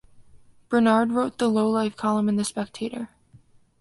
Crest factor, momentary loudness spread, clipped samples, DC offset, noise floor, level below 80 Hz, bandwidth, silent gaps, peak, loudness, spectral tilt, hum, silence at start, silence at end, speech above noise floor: 18 dB; 12 LU; under 0.1%; under 0.1%; -55 dBFS; -62 dBFS; 11.5 kHz; none; -6 dBFS; -23 LUFS; -5.5 dB/octave; none; 0.2 s; 0.75 s; 32 dB